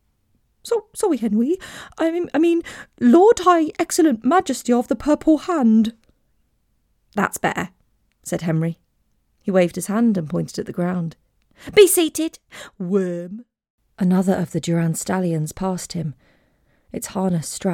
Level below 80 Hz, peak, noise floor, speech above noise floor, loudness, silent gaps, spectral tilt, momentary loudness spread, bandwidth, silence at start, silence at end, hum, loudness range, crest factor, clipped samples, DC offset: -54 dBFS; -2 dBFS; -65 dBFS; 46 dB; -20 LUFS; 13.70-13.78 s; -5.5 dB/octave; 17 LU; 18 kHz; 0.65 s; 0 s; none; 7 LU; 18 dB; under 0.1%; under 0.1%